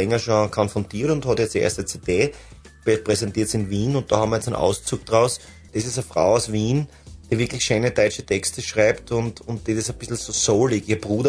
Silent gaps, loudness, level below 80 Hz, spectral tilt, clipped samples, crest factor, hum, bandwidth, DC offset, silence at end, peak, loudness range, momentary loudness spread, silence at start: none; -22 LUFS; -46 dBFS; -4.5 dB/octave; under 0.1%; 20 dB; none; 11 kHz; under 0.1%; 0 s; -2 dBFS; 1 LU; 7 LU; 0 s